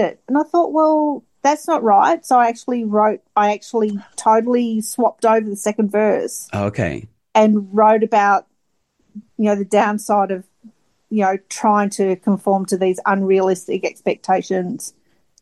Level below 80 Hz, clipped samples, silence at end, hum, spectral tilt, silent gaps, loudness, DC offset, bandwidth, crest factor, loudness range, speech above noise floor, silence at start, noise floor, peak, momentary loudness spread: -60 dBFS; under 0.1%; 0.5 s; none; -5.5 dB/octave; none; -17 LUFS; under 0.1%; 12.5 kHz; 14 dB; 3 LU; 53 dB; 0 s; -69 dBFS; -2 dBFS; 8 LU